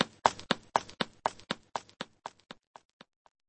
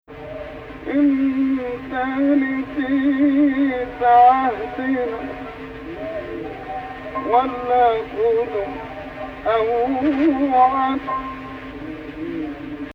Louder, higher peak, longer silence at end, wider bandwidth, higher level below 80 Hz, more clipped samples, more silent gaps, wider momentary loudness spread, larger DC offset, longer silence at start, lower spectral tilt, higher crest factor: second, -35 LUFS vs -19 LUFS; about the same, -4 dBFS vs -4 dBFS; first, 1.2 s vs 0 s; first, 8.4 kHz vs 5.4 kHz; second, -66 dBFS vs -46 dBFS; neither; neither; first, 21 LU vs 17 LU; neither; about the same, 0 s vs 0.1 s; second, -3 dB/octave vs -7.5 dB/octave; first, 32 dB vs 16 dB